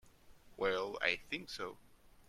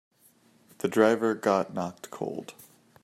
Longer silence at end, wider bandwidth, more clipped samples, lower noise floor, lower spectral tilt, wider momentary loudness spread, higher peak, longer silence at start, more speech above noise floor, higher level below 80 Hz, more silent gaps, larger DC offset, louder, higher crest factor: second, 0.05 s vs 0.5 s; about the same, 15.5 kHz vs 15.5 kHz; neither; about the same, -61 dBFS vs -62 dBFS; second, -3.5 dB/octave vs -5.5 dB/octave; second, 10 LU vs 14 LU; second, -16 dBFS vs -8 dBFS; second, 0.05 s vs 0.85 s; second, 22 dB vs 35 dB; first, -66 dBFS vs -76 dBFS; neither; neither; second, -38 LUFS vs -27 LUFS; about the same, 26 dB vs 22 dB